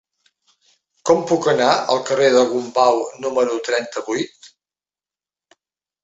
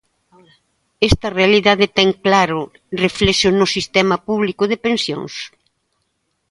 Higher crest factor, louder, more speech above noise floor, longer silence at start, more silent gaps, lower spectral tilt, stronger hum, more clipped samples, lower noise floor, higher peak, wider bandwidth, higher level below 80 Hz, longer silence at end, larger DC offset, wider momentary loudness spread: about the same, 18 dB vs 18 dB; about the same, -18 LUFS vs -16 LUFS; first, over 73 dB vs 53 dB; about the same, 1.05 s vs 1 s; neither; about the same, -4 dB/octave vs -4.5 dB/octave; neither; neither; first, under -90 dBFS vs -69 dBFS; about the same, -2 dBFS vs 0 dBFS; second, 8 kHz vs 11.5 kHz; second, -64 dBFS vs -36 dBFS; first, 1.55 s vs 1.05 s; neither; about the same, 10 LU vs 12 LU